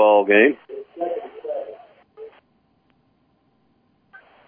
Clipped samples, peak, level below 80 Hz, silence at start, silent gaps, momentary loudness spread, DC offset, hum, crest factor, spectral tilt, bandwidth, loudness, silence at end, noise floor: under 0.1%; -4 dBFS; -76 dBFS; 0 s; none; 29 LU; under 0.1%; none; 20 dB; -8.5 dB/octave; 3.6 kHz; -20 LUFS; 2.2 s; -64 dBFS